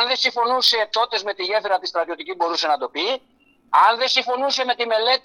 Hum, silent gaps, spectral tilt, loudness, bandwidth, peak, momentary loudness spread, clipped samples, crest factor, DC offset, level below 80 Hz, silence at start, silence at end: none; none; 0 dB/octave; -20 LUFS; 18 kHz; 0 dBFS; 8 LU; under 0.1%; 20 dB; under 0.1%; -72 dBFS; 0 s; 0.05 s